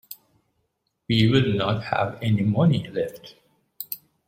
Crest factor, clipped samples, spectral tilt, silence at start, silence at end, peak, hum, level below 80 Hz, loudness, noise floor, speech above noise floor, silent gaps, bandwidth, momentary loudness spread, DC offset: 20 dB; under 0.1%; -7 dB/octave; 0.1 s; 0.3 s; -4 dBFS; none; -56 dBFS; -23 LUFS; -74 dBFS; 52 dB; none; 16.5 kHz; 19 LU; under 0.1%